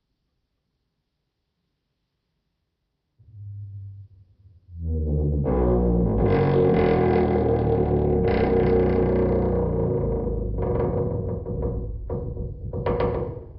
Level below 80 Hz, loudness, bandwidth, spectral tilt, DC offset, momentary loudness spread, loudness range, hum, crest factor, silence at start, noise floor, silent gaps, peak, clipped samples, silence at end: -32 dBFS; -23 LUFS; 5.4 kHz; -12 dB/octave; under 0.1%; 13 LU; 8 LU; none; 16 dB; 3.35 s; -77 dBFS; none; -8 dBFS; under 0.1%; 0 s